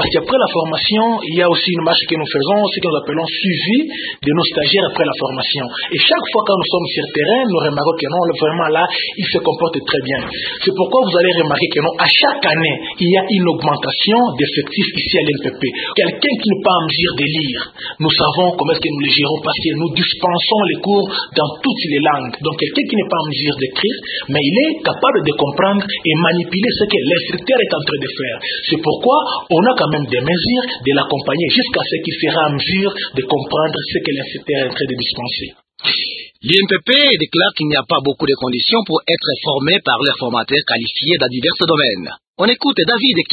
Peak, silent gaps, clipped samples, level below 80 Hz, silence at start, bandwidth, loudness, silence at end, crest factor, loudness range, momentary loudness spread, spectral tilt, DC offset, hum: 0 dBFS; 42.28-42.34 s; under 0.1%; -50 dBFS; 0 s; 4.9 kHz; -15 LUFS; 0 s; 16 dB; 3 LU; 6 LU; -7.5 dB/octave; under 0.1%; none